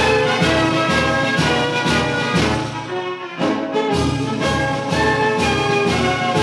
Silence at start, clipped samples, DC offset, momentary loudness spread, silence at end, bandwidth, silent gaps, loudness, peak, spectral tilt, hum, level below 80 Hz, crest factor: 0 s; under 0.1%; under 0.1%; 7 LU; 0 s; 13 kHz; none; -18 LUFS; -4 dBFS; -5 dB/octave; none; -38 dBFS; 14 dB